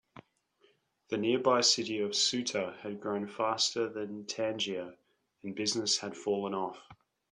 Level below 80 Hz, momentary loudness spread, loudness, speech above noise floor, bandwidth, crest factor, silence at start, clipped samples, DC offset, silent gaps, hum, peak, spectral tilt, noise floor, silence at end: -76 dBFS; 13 LU; -31 LUFS; 37 dB; 11 kHz; 20 dB; 0.15 s; under 0.1%; under 0.1%; none; none; -14 dBFS; -2.5 dB/octave; -70 dBFS; 0.4 s